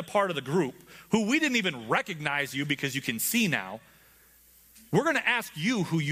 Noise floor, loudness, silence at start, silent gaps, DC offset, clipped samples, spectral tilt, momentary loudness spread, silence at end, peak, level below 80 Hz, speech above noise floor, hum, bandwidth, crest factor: -58 dBFS; -27 LUFS; 0 s; none; under 0.1%; under 0.1%; -4 dB/octave; 5 LU; 0 s; -8 dBFS; -68 dBFS; 30 dB; none; 15.5 kHz; 20 dB